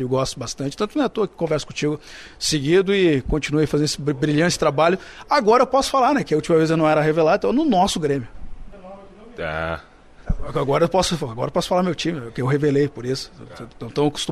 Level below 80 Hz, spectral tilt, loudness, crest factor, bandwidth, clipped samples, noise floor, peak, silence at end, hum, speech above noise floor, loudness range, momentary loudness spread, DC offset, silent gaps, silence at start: -38 dBFS; -5 dB/octave; -20 LUFS; 16 dB; 15 kHz; under 0.1%; -41 dBFS; -4 dBFS; 0 s; none; 21 dB; 6 LU; 12 LU; under 0.1%; none; 0 s